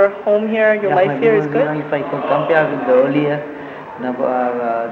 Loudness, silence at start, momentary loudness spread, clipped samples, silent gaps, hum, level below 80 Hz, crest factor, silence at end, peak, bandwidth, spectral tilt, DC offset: -16 LUFS; 0 s; 10 LU; under 0.1%; none; none; -62 dBFS; 14 dB; 0 s; -2 dBFS; 6.6 kHz; -8.5 dB/octave; under 0.1%